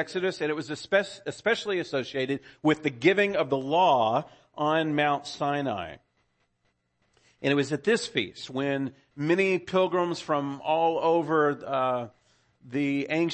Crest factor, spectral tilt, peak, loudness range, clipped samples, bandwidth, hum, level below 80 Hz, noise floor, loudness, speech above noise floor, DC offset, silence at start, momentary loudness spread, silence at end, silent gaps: 20 dB; -5.5 dB/octave; -8 dBFS; 5 LU; under 0.1%; 8.8 kHz; none; -68 dBFS; -74 dBFS; -27 LUFS; 47 dB; under 0.1%; 0 s; 9 LU; 0 s; none